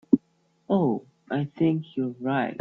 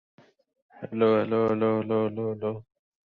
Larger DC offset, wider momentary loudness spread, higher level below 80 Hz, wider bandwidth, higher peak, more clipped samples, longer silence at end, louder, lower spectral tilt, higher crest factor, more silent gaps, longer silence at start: neither; second, 7 LU vs 13 LU; about the same, -66 dBFS vs -66 dBFS; about the same, 4.2 kHz vs 4.5 kHz; first, -4 dBFS vs -10 dBFS; neither; second, 0 s vs 0.45 s; about the same, -27 LUFS vs -26 LUFS; about the same, -10 dB/octave vs -9.5 dB/octave; first, 22 dB vs 16 dB; neither; second, 0.1 s vs 0.75 s